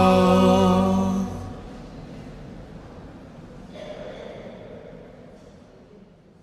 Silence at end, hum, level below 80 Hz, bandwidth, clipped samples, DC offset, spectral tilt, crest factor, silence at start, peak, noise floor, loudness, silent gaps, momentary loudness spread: 1.4 s; none; -46 dBFS; 12.5 kHz; under 0.1%; under 0.1%; -7 dB/octave; 20 dB; 0 s; -4 dBFS; -50 dBFS; -19 LUFS; none; 26 LU